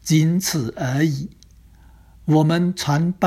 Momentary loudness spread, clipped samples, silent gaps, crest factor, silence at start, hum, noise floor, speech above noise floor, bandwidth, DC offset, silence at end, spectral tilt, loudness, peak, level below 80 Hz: 11 LU; under 0.1%; none; 16 dB; 0.05 s; none; -48 dBFS; 29 dB; 14.5 kHz; under 0.1%; 0 s; -5.5 dB/octave; -20 LUFS; -4 dBFS; -50 dBFS